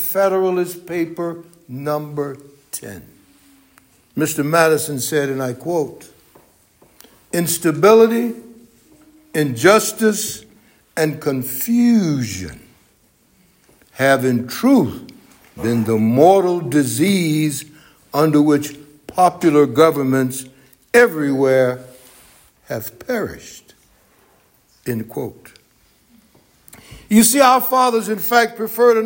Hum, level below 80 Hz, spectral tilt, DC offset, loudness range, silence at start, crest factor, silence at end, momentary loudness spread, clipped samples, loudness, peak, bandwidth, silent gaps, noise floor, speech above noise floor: none; -56 dBFS; -5 dB/octave; under 0.1%; 12 LU; 0 s; 18 dB; 0 s; 17 LU; under 0.1%; -17 LUFS; 0 dBFS; 17 kHz; none; -57 dBFS; 41 dB